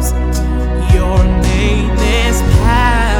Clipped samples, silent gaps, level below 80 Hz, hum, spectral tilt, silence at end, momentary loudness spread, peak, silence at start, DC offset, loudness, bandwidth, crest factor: under 0.1%; none; -14 dBFS; none; -5.5 dB/octave; 0 s; 5 LU; 0 dBFS; 0 s; under 0.1%; -13 LUFS; 17 kHz; 10 dB